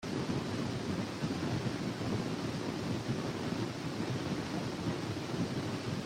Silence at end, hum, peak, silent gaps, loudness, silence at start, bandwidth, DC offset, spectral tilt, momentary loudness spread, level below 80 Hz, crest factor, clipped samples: 0 s; none; -22 dBFS; none; -37 LUFS; 0 s; 16 kHz; under 0.1%; -6 dB/octave; 2 LU; -60 dBFS; 14 dB; under 0.1%